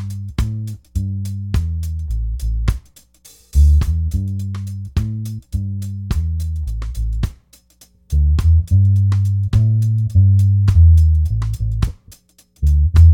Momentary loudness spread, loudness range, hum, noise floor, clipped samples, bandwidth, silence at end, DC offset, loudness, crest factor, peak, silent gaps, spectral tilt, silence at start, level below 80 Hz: 12 LU; 10 LU; none; -51 dBFS; under 0.1%; 11.5 kHz; 0 s; under 0.1%; -18 LUFS; 16 dB; 0 dBFS; none; -7.5 dB/octave; 0 s; -22 dBFS